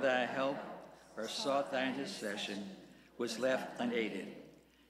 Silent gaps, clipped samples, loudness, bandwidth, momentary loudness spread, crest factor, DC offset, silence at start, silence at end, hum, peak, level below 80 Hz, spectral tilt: none; under 0.1%; -38 LUFS; 15.5 kHz; 16 LU; 18 dB; under 0.1%; 0 s; 0.35 s; none; -20 dBFS; -78 dBFS; -3.5 dB/octave